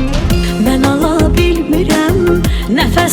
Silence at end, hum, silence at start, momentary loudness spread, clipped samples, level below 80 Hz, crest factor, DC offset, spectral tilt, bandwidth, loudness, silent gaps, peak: 0 s; none; 0 s; 3 LU; under 0.1%; -18 dBFS; 12 dB; under 0.1%; -5.5 dB/octave; 20 kHz; -12 LUFS; none; 0 dBFS